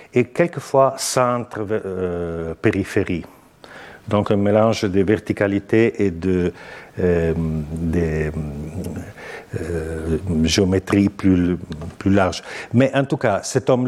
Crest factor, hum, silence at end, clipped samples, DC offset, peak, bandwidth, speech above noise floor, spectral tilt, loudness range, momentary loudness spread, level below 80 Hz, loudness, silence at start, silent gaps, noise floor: 18 dB; none; 0 s; under 0.1%; under 0.1%; -2 dBFS; 15 kHz; 23 dB; -6 dB/octave; 5 LU; 12 LU; -40 dBFS; -20 LUFS; 0 s; none; -42 dBFS